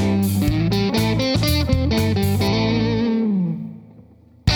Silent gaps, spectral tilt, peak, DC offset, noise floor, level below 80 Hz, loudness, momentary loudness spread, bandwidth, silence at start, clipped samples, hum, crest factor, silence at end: none; -6 dB/octave; -2 dBFS; under 0.1%; -47 dBFS; -32 dBFS; -19 LUFS; 4 LU; over 20 kHz; 0 s; under 0.1%; none; 16 dB; 0 s